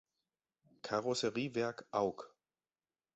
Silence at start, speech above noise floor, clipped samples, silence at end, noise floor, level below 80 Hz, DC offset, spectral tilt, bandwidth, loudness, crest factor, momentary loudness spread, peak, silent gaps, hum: 0.85 s; over 53 dB; under 0.1%; 0.9 s; under -90 dBFS; -76 dBFS; under 0.1%; -3.5 dB/octave; 8 kHz; -38 LUFS; 20 dB; 16 LU; -20 dBFS; none; none